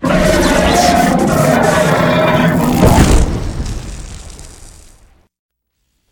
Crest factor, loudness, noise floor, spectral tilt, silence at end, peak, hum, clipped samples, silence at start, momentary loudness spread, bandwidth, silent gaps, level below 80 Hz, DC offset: 12 dB; -11 LUFS; -66 dBFS; -5.5 dB/octave; 1.4 s; 0 dBFS; none; under 0.1%; 0 s; 16 LU; 20 kHz; none; -20 dBFS; under 0.1%